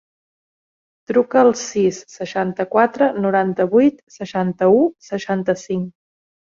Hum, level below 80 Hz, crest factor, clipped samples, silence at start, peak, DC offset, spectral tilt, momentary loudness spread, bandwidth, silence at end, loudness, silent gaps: none; -62 dBFS; 16 dB; under 0.1%; 1.1 s; -2 dBFS; under 0.1%; -6 dB/octave; 11 LU; 7.6 kHz; 0.55 s; -18 LUFS; 4.03-4.07 s